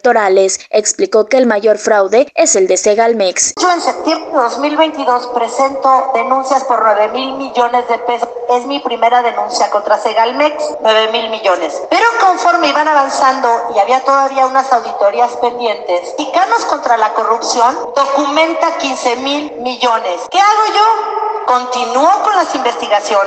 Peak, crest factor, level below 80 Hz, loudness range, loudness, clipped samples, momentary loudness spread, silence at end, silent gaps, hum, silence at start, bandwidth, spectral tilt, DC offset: 0 dBFS; 12 dB; -60 dBFS; 2 LU; -12 LUFS; under 0.1%; 6 LU; 0 s; none; none; 0.05 s; 9.4 kHz; -1.5 dB/octave; under 0.1%